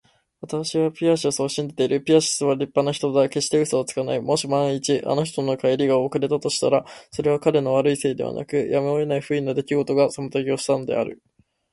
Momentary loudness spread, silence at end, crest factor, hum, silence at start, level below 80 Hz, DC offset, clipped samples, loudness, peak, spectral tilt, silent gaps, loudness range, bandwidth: 6 LU; 0.6 s; 18 dB; none; 0.4 s; -62 dBFS; under 0.1%; under 0.1%; -22 LUFS; -4 dBFS; -5 dB/octave; none; 2 LU; 11.5 kHz